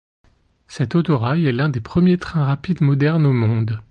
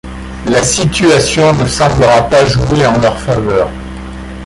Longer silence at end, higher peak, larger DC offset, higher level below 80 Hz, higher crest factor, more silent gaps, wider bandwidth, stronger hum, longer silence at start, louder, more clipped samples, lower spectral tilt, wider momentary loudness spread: about the same, 0.1 s vs 0 s; second, -6 dBFS vs 0 dBFS; neither; second, -46 dBFS vs -26 dBFS; about the same, 12 dB vs 10 dB; neither; second, 8.8 kHz vs 11.5 kHz; neither; first, 0.7 s vs 0.05 s; second, -18 LUFS vs -10 LUFS; neither; first, -8.5 dB/octave vs -4.5 dB/octave; second, 5 LU vs 17 LU